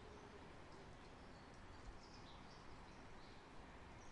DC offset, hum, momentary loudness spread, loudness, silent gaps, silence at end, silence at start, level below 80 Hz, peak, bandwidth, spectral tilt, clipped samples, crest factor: under 0.1%; none; 1 LU; -60 LUFS; none; 0 s; 0 s; -66 dBFS; -44 dBFS; 11 kHz; -5 dB/octave; under 0.1%; 14 dB